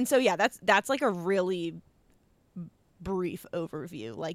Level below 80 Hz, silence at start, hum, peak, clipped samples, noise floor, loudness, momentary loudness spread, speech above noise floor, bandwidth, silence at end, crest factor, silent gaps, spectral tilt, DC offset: -62 dBFS; 0 s; none; -10 dBFS; under 0.1%; -65 dBFS; -29 LUFS; 21 LU; 37 dB; 16 kHz; 0 s; 20 dB; none; -4.5 dB/octave; under 0.1%